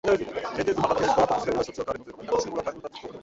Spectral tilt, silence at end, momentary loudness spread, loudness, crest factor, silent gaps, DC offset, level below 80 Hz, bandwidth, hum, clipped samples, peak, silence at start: -5 dB/octave; 0 s; 13 LU; -26 LUFS; 18 dB; none; under 0.1%; -52 dBFS; 8 kHz; none; under 0.1%; -8 dBFS; 0.05 s